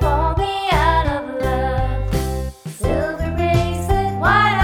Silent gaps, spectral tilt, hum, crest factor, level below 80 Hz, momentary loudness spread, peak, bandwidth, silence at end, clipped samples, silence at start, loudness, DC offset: none; -6 dB/octave; none; 16 dB; -24 dBFS; 7 LU; -2 dBFS; 17 kHz; 0 s; under 0.1%; 0 s; -19 LUFS; under 0.1%